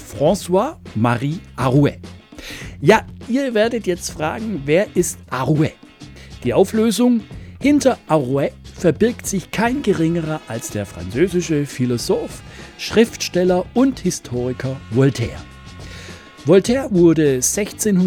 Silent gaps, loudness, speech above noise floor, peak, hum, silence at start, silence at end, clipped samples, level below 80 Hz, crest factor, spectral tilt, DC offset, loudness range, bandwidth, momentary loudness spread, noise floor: none; -18 LUFS; 22 dB; -2 dBFS; none; 0 s; 0 s; under 0.1%; -44 dBFS; 18 dB; -5.5 dB/octave; under 0.1%; 3 LU; 19.5 kHz; 17 LU; -39 dBFS